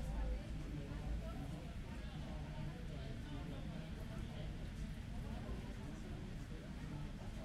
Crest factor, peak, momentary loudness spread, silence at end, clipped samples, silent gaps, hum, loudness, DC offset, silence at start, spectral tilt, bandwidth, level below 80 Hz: 14 dB; -32 dBFS; 3 LU; 0 s; under 0.1%; none; none; -48 LUFS; under 0.1%; 0 s; -6.5 dB/octave; 13.5 kHz; -48 dBFS